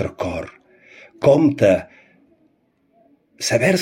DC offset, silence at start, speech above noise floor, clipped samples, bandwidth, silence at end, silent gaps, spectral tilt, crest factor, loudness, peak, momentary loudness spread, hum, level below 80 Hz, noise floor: under 0.1%; 0 s; 45 dB; under 0.1%; 16.5 kHz; 0 s; none; -5.5 dB/octave; 18 dB; -18 LUFS; -2 dBFS; 13 LU; none; -52 dBFS; -63 dBFS